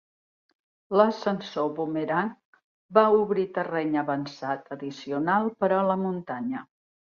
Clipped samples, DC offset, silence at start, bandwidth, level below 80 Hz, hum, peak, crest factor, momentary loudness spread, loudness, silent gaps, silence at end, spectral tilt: under 0.1%; under 0.1%; 0.9 s; 7 kHz; -72 dBFS; none; -4 dBFS; 24 dB; 11 LU; -26 LUFS; 2.45-2.53 s, 2.64-2.89 s; 0.55 s; -7 dB/octave